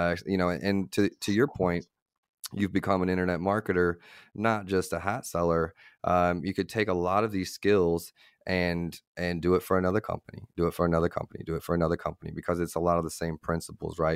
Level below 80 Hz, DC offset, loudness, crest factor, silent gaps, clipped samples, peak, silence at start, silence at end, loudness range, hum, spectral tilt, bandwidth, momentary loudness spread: -52 dBFS; under 0.1%; -29 LUFS; 18 dB; 2.02-2.06 s, 2.18-2.23 s, 2.29-2.43 s, 9.07-9.15 s; under 0.1%; -10 dBFS; 0 s; 0 s; 2 LU; none; -6 dB/octave; 16 kHz; 10 LU